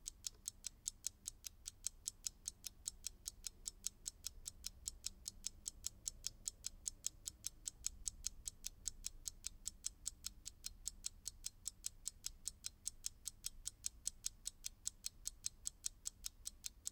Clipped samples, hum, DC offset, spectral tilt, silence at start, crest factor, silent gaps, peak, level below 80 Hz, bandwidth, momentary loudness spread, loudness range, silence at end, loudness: under 0.1%; none; under 0.1%; 0.5 dB/octave; 0 s; 32 dB; none; -18 dBFS; -62 dBFS; 18 kHz; 4 LU; 2 LU; 0 s; -48 LUFS